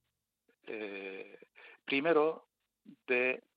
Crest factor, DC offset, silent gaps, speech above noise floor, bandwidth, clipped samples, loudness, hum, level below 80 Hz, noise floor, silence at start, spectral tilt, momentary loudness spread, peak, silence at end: 20 dB; under 0.1%; none; 47 dB; 5 kHz; under 0.1%; -33 LUFS; none; under -90 dBFS; -80 dBFS; 0.65 s; -7 dB/octave; 19 LU; -16 dBFS; 0.15 s